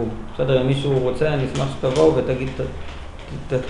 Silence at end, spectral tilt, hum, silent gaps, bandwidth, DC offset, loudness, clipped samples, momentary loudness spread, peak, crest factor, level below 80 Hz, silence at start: 0 s; -7 dB/octave; none; none; 11 kHz; 0.1%; -21 LUFS; under 0.1%; 17 LU; -2 dBFS; 18 dB; -36 dBFS; 0 s